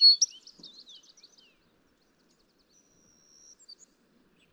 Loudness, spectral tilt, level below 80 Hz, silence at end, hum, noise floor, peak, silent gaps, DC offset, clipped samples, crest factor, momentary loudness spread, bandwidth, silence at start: -21 LUFS; 3.5 dB/octave; -82 dBFS; 4.25 s; none; -68 dBFS; -12 dBFS; none; under 0.1%; under 0.1%; 20 dB; 30 LU; 9.2 kHz; 0 s